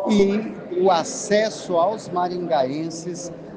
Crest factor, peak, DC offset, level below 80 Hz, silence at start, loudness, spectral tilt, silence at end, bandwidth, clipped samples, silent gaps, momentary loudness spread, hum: 16 dB; -6 dBFS; under 0.1%; -54 dBFS; 0 s; -22 LUFS; -5 dB/octave; 0 s; 10 kHz; under 0.1%; none; 10 LU; none